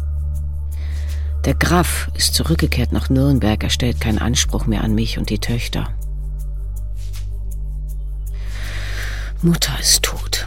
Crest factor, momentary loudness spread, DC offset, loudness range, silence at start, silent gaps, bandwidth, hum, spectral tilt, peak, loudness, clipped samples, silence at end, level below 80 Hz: 18 dB; 13 LU; 1%; 10 LU; 0 s; none; 17 kHz; none; -4 dB/octave; 0 dBFS; -20 LUFS; under 0.1%; 0 s; -24 dBFS